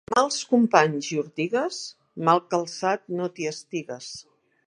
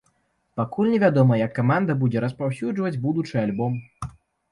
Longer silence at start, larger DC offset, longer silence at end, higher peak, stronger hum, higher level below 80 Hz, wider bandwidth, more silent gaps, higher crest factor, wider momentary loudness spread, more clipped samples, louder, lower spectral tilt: second, 0.1 s vs 0.55 s; neither; about the same, 0.45 s vs 0.4 s; first, -2 dBFS vs -6 dBFS; neither; second, -72 dBFS vs -56 dBFS; about the same, 10.5 kHz vs 11 kHz; neither; first, 24 dB vs 18 dB; about the same, 16 LU vs 14 LU; neither; about the same, -24 LUFS vs -23 LUFS; second, -4.5 dB/octave vs -9 dB/octave